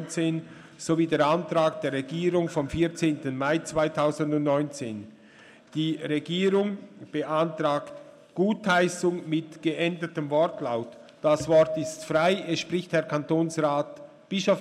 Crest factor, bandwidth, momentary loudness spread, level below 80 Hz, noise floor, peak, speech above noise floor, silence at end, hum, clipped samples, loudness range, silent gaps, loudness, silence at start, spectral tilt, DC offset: 16 dB; 13 kHz; 12 LU; -58 dBFS; -52 dBFS; -10 dBFS; 26 dB; 0 s; none; under 0.1%; 3 LU; none; -26 LUFS; 0 s; -5.5 dB/octave; under 0.1%